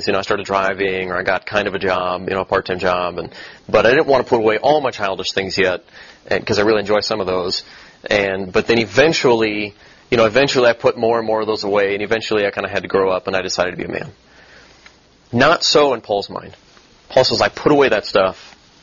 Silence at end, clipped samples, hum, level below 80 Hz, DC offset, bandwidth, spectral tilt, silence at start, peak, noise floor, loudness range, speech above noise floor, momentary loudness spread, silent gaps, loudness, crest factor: 0.35 s; under 0.1%; none; -48 dBFS; under 0.1%; 7.4 kHz; -4 dB/octave; 0 s; 0 dBFS; -48 dBFS; 4 LU; 31 dB; 10 LU; none; -17 LUFS; 18 dB